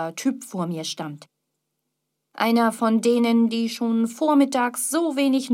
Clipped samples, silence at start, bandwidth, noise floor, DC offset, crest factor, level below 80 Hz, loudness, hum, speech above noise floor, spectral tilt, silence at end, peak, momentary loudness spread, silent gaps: under 0.1%; 0 s; 16 kHz; -78 dBFS; under 0.1%; 16 dB; -80 dBFS; -22 LUFS; none; 57 dB; -4.5 dB/octave; 0 s; -6 dBFS; 10 LU; none